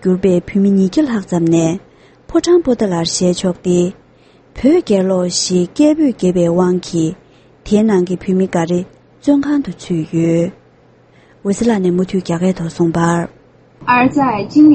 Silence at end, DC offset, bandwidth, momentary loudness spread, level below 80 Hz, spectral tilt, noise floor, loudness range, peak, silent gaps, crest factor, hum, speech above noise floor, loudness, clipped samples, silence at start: 0 s; under 0.1%; 8.8 kHz; 8 LU; -44 dBFS; -6 dB/octave; -48 dBFS; 3 LU; 0 dBFS; none; 14 dB; none; 34 dB; -15 LUFS; under 0.1%; 0 s